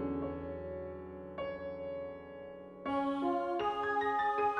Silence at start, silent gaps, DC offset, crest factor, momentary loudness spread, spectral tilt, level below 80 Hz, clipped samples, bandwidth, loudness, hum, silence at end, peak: 0 s; none; under 0.1%; 14 dB; 14 LU; -7 dB/octave; -60 dBFS; under 0.1%; 9.8 kHz; -37 LUFS; none; 0 s; -22 dBFS